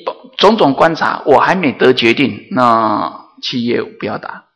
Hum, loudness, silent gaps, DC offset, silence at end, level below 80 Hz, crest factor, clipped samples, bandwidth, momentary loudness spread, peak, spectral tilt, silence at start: none; -13 LUFS; none; under 0.1%; 0.15 s; -52 dBFS; 14 dB; 0.6%; 11 kHz; 13 LU; 0 dBFS; -5.5 dB/octave; 0.05 s